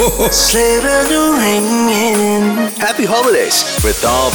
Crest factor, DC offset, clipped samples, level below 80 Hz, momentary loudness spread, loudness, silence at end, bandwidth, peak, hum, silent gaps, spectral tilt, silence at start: 10 dB; under 0.1%; under 0.1%; -28 dBFS; 4 LU; -12 LUFS; 0 s; over 20 kHz; -2 dBFS; none; none; -3 dB/octave; 0 s